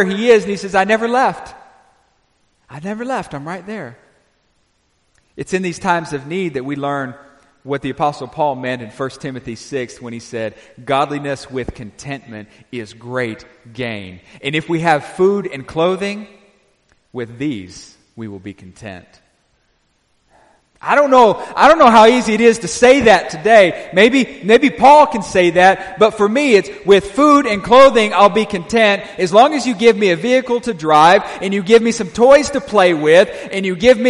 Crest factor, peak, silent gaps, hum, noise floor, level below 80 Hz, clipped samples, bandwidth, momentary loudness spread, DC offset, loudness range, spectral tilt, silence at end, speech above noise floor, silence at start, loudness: 14 dB; 0 dBFS; none; none; -62 dBFS; -48 dBFS; under 0.1%; 11.5 kHz; 20 LU; under 0.1%; 16 LU; -4.5 dB/octave; 0 s; 48 dB; 0 s; -13 LUFS